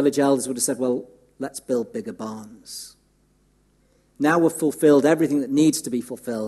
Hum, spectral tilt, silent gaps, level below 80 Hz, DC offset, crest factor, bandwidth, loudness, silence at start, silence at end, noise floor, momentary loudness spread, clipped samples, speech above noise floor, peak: none; -4.5 dB/octave; none; -66 dBFS; under 0.1%; 18 dB; 13 kHz; -21 LUFS; 0 s; 0 s; -62 dBFS; 19 LU; under 0.1%; 41 dB; -4 dBFS